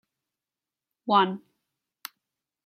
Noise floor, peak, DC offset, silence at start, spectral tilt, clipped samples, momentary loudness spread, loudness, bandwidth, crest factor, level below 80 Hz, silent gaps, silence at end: under -90 dBFS; -8 dBFS; under 0.1%; 1.05 s; -5 dB/octave; under 0.1%; 21 LU; -24 LUFS; 16.5 kHz; 24 dB; -80 dBFS; none; 1.25 s